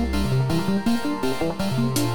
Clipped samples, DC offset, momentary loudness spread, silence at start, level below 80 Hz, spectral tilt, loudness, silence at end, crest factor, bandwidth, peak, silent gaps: under 0.1%; 3%; 3 LU; 0 s; -36 dBFS; -6 dB/octave; -23 LUFS; 0 s; 14 dB; over 20 kHz; -8 dBFS; none